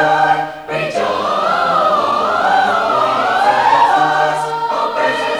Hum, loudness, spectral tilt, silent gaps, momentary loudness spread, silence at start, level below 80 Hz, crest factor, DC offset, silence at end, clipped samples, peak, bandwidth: none; -14 LUFS; -4 dB/octave; none; 7 LU; 0 s; -54 dBFS; 12 dB; under 0.1%; 0 s; under 0.1%; -2 dBFS; 19.5 kHz